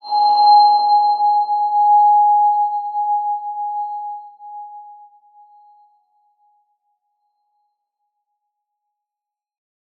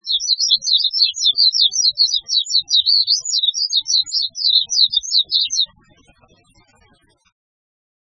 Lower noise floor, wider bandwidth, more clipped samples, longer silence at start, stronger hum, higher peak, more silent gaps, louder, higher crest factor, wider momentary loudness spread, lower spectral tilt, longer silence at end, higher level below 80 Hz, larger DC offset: first, -86 dBFS vs -56 dBFS; second, 4.6 kHz vs 7.8 kHz; neither; about the same, 0.05 s vs 0.05 s; neither; about the same, -2 dBFS vs 0 dBFS; neither; about the same, -15 LUFS vs -14 LUFS; about the same, 16 dB vs 18 dB; first, 23 LU vs 5 LU; first, -3 dB/octave vs 4.5 dB/octave; first, 5.05 s vs 2.4 s; second, under -90 dBFS vs -64 dBFS; neither